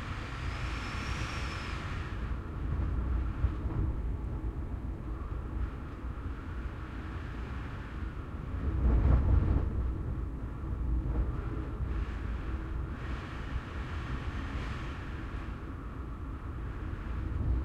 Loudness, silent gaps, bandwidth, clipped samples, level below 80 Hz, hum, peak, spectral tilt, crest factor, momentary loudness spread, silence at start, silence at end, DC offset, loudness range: -36 LUFS; none; 8.4 kHz; under 0.1%; -36 dBFS; none; -14 dBFS; -7.5 dB/octave; 18 dB; 9 LU; 0 s; 0 s; under 0.1%; 8 LU